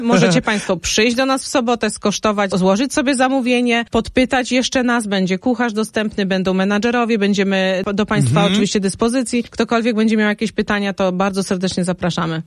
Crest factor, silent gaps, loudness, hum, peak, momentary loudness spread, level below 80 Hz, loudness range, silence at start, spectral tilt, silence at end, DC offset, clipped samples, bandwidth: 16 dB; none; -17 LUFS; none; 0 dBFS; 5 LU; -44 dBFS; 1 LU; 0 s; -5 dB/octave; 0.05 s; under 0.1%; under 0.1%; 12.5 kHz